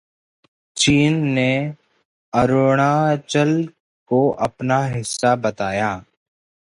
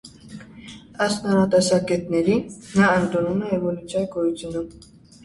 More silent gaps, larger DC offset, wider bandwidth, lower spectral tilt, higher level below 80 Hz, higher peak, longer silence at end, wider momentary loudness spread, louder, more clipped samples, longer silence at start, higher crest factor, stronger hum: first, 2.05-2.32 s, 3.80-4.06 s vs none; neither; about the same, 11.5 kHz vs 11.5 kHz; about the same, -5 dB/octave vs -5.5 dB/octave; about the same, -50 dBFS vs -52 dBFS; about the same, -4 dBFS vs -4 dBFS; first, 0.7 s vs 0.5 s; second, 8 LU vs 22 LU; first, -19 LUFS vs -22 LUFS; neither; first, 0.75 s vs 0.05 s; about the same, 16 dB vs 18 dB; neither